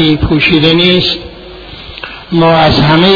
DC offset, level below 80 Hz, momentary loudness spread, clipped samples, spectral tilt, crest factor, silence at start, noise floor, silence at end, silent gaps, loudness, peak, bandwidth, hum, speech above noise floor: under 0.1%; -28 dBFS; 21 LU; 0.3%; -7 dB/octave; 10 dB; 0 s; -29 dBFS; 0 s; none; -8 LUFS; 0 dBFS; 5.4 kHz; none; 21 dB